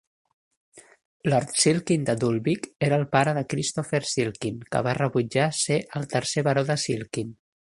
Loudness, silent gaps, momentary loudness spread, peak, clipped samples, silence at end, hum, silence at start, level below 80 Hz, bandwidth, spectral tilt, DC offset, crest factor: -25 LUFS; 1.05-1.20 s; 7 LU; -4 dBFS; under 0.1%; 0.35 s; none; 0.75 s; -60 dBFS; 11.5 kHz; -4.5 dB/octave; under 0.1%; 22 dB